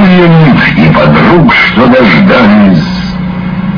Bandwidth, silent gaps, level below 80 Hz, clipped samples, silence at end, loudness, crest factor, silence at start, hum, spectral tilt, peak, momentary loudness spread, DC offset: 5.4 kHz; none; -26 dBFS; 7%; 0 s; -4 LUFS; 4 dB; 0 s; none; -8 dB/octave; 0 dBFS; 10 LU; under 0.1%